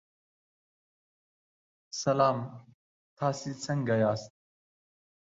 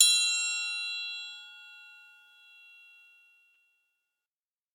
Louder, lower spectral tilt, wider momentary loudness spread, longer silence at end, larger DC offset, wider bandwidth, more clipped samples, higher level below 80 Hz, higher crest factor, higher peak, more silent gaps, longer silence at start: about the same, -30 LUFS vs -28 LUFS; first, -5.5 dB/octave vs 10.5 dB/octave; second, 11 LU vs 25 LU; second, 1.05 s vs 2.8 s; neither; second, 7.8 kHz vs 18 kHz; neither; first, -70 dBFS vs under -90 dBFS; second, 22 dB vs 28 dB; second, -12 dBFS vs -6 dBFS; first, 2.74-3.16 s vs none; first, 1.95 s vs 0 s